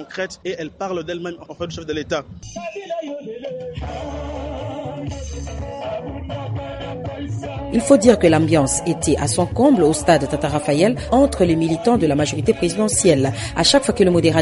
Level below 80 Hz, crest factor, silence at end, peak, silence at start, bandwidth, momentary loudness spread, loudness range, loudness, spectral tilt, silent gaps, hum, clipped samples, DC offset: -38 dBFS; 18 dB; 0 s; 0 dBFS; 0 s; 11.5 kHz; 15 LU; 13 LU; -19 LUFS; -5 dB/octave; none; none; under 0.1%; under 0.1%